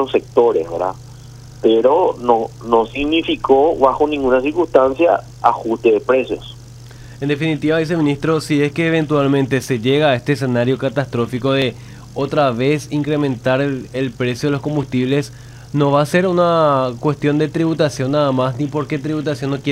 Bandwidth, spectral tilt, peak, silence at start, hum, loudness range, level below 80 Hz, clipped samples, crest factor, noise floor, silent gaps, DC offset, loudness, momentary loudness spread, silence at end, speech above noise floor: 15.5 kHz; -6.5 dB/octave; 0 dBFS; 0 s; none; 3 LU; -46 dBFS; under 0.1%; 16 dB; -36 dBFS; none; under 0.1%; -17 LUFS; 8 LU; 0 s; 20 dB